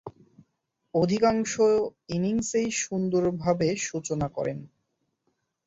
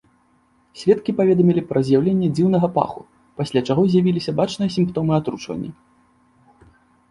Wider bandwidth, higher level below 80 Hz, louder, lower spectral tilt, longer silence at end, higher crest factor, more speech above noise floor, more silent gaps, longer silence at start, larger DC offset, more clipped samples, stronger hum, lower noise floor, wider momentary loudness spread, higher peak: second, 8 kHz vs 11 kHz; about the same, -58 dBFS vs -54 dBFS; second, -26 LUFS vs -19 LUFS; second, -5 dB/octave vs -8 dB/octave; second, 1 s vs 1.4 s; about the same, 18 dB vs 18 dB; first, 52 dB vs 41 dB; neither; second, 0.05 s vs 0.75 s; neither; neither; neither; first, -78 dBFS vs -60 dBFS; second, 8 LU vs 12 LU; second, -10 dBFS vs -2 dBFS